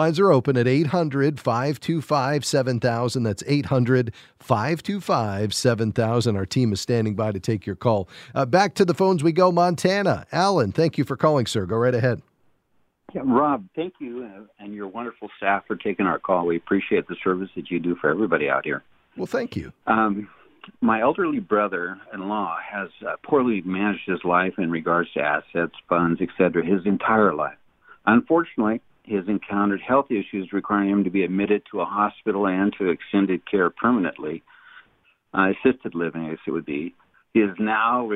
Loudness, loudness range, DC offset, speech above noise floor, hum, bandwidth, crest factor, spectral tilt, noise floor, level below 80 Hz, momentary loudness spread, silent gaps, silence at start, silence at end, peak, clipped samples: -23 LUFS; 4 LU; under 0.1%; 45 dB; none; 15 kHz; 20 dB; -6.5 dB/octave; -67 dBFS; -58 dBFS; 11 LU; none; 0 s; 0 s; -2 dBFS; under 0.1%